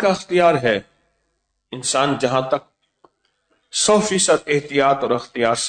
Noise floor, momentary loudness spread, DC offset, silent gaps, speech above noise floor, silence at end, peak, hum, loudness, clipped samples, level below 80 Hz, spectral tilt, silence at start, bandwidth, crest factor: -71 dBFS; 9 LU; under 0.1%; none; 53 dB; 0 s; -4 dBFS; none; -18 LUFS; under 0.1%; -56 dBFS; -3.5 dB/octave; 0 s; 9.4 kHz; 16 dB